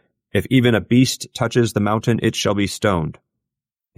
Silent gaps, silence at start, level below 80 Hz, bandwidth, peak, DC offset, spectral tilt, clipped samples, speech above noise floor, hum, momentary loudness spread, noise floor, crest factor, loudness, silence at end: none; 0.35 s; -48 dBFS; 16 kHz; -4 dBFS; under 0.1%; -5.5 dB/octave; under 0.1%; 68 dB; none; 8 LU; -86 dBFS; 16 dB; -19 LUFS; 0.85 s